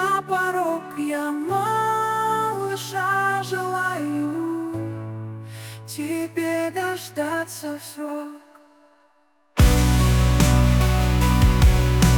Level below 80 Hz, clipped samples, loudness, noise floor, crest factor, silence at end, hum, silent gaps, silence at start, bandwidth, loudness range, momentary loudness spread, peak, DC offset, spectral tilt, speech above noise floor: -26 dBFS; under 0.1%; -22 LUFS; -63 dBFS; 16 dB; 0 s; none; none; 0 s; 19.5 kHz; 8 LU; 14 LU; -6 dBFS; under 0.1%; -5.5 dB/octave; 37 dB